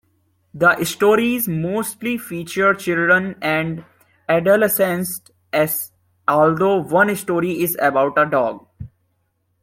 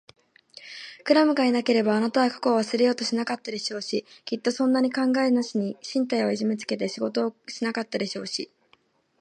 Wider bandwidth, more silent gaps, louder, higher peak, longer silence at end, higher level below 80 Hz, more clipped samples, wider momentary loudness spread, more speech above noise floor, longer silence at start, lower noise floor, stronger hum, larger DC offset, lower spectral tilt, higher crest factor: first, 16.5 kHz vs 10 kHz; neither; first, -18 LUFS vs -25 LUFS; first, -2 dBFS vs -6 dBFS; about the same, 0.75 s vs 0.75 s; first, -56 dBFS vs -78 dBFS; neither; about the same, 10 LU vs 10 LU; first, 50 dB vs 40 dB; about the same, 0.55 s vs 0.6 s; first, -68 dBFS vs -64 dBFS; neither; neither; about the same, -5 dB/octave vs -4.5 dB/octave; about the same, 18 dB vs 20 dB